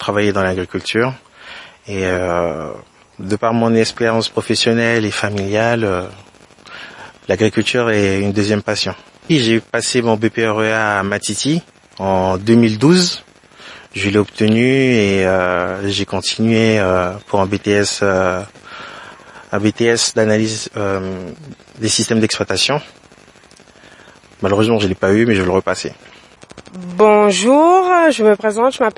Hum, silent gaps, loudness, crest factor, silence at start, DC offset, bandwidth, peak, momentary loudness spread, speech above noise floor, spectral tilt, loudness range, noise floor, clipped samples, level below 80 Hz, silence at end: none; none; -15 LUFS; 16 dB; 0 s; under 0.1%; 11.5 kHz; 0 dBFS; 19 LU; 30 dB; -4.5 dB/octave; 4 LU; -45 dBFS; under 0.1%; -54 dBFS; 0.05 s